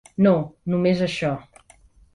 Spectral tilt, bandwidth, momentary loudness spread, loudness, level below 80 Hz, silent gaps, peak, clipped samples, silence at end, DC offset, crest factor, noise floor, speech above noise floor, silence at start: -7.5 dB/octave; 11 kHz; 8 LU; -22 LUFS; -56 dBFS; none; -6 dBFS; under 0.1%; 0.75 s; under 0.1%; 18 dB; -53 dBFS; 33 dB; 0.2 s